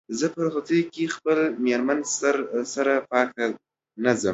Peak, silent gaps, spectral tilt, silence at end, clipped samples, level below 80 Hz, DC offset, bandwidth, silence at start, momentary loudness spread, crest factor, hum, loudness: -4 dBFS; none; -4 dB/octave; 0 s; under 0.1%; -68 dBFS; under 0.1%; 8.2 kHz; 0.1 s; 5 LU; 20 dB; none; -24 LUFS